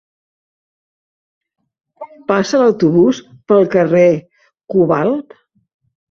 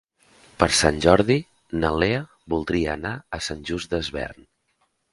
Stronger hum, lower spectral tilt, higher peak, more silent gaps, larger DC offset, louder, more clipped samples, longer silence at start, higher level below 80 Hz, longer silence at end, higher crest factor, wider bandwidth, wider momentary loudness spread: neither; first, -7 dB/octave vs -4.5 dB/octave; about the same, 0 dBFS vs 0 dBFS; neither; neither; first, -14 LUFS vs -23 LUFS; neither; first, 2 s vs 0.6 s; second, -56 dBFS vs -40 dBFS; about the same, 0.9 s vs 0.8 s; second, 16 dB vs 24 dB; second, 7.4 kHz vs 11.5 kHz; about the same, 10 LU vs 12 LU